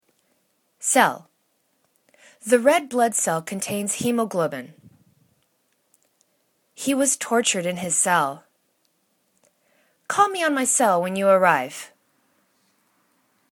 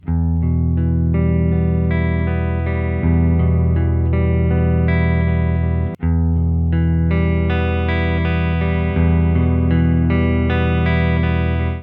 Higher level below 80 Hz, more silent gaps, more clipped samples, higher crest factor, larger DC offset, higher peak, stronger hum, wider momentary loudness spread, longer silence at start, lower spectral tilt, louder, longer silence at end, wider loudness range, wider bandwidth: second, -74 dBFS vs -22 dBFS; neither; neither; first, 24 dB vs 12 dB; neither; first, 0 dBFS vs -4 dBFS; neither; first, 12 LU vs 3 LU; first, 0.8 s vs 0.05 s; second, -3 dB/octave vs -11 dB/octave; second, -21 LUFS vs -17 LUFS; first, 1.65 s vs 0 s; first, 6 LU vs 1 LU; first, 19 kHz vs 4.2 kHz